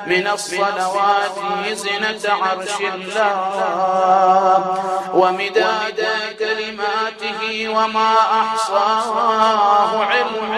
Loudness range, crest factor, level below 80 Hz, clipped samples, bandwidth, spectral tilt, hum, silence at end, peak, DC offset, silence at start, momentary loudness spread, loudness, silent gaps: 3 LU; 16 dB; -64 dBFS; under 0.1%; 13.5 kHz; -3 dB/octave; none; 0 s; -2 dBFS; under 0.1%; 0 s; 7 LU; -17 LUFS; none